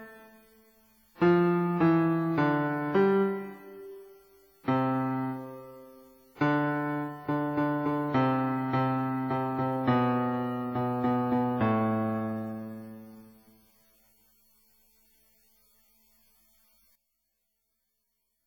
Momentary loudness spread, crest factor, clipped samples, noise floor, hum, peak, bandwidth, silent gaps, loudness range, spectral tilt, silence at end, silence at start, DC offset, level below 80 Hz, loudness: 19 LU; 18 dB; under 0.1%; -80 dBFS; none; -12 dBFS; 19.5 kHz; none; 7 LU; -9 dB/octave; 5.2 s; 0 s; under 0.1%; -66 dBFS; -28 LUFS